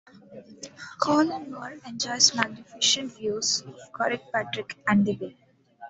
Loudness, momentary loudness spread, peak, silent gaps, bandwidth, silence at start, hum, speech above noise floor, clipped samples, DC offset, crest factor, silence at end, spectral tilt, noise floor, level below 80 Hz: -25 LUFS; 20 LU; -4 dBFS; none; 8.2 kHz; 0.15 s; none; 20 dB; under 0.1%; under 0.1%; 24 dB; 0 s; -2.5 dB/octave; -47 dBFS; -70 dBFS